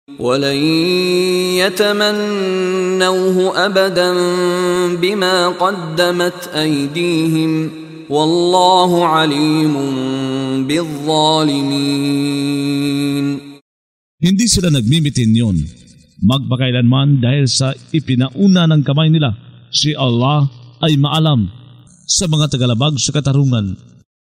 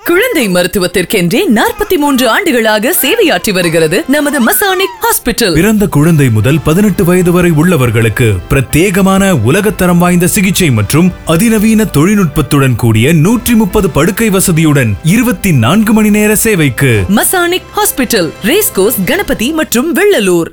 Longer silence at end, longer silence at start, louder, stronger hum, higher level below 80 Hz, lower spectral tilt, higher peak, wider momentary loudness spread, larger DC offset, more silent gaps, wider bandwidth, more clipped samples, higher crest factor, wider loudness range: first, 0.65 s vs 0 s; about the same, 0.1 s vs 0.05 s; second, -14 LUFS vs -9 LUFS; neither; second, -44 dBFS vs -30 dBFS; about the same, -5 dB/octave vs -5 dB/octave; about the same, 0 dBFS vs 0 dBFS; first, 6 LU vs 3 LU; second, under 0.1% vs 0.5%; first, 13.61-14.18 s vs none; second, 15.5 kHz vs over 20 kHz; neither; first, 14 dB vs 8 dB; about the same, 2 LU vs 1 LU